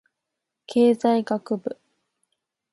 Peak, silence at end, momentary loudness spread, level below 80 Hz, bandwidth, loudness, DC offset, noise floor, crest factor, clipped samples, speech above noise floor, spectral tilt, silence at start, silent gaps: -8 dBFS; 1 s; 15 LU; -76 dBFS; 11.5 kHz; -22 LUFS; under 0.1%; -83 dBFS; 18 dB; under 0.1%; 62 dB; -6.5 dB/octave; 0.7 s; none